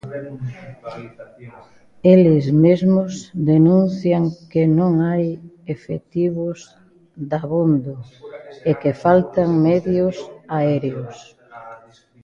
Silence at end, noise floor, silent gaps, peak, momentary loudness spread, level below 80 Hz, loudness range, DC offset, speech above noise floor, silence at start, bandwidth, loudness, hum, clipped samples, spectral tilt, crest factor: 0.45 s; -46 dBFS; none; 0 dBFS; 21 LU; -54 dBFS; 7 LU; under 0.1%; 29 dB; 0.05 s; 7.4 kHz; -18 LUFS; none; under 0.1%; -9 dB/octave; 18 dB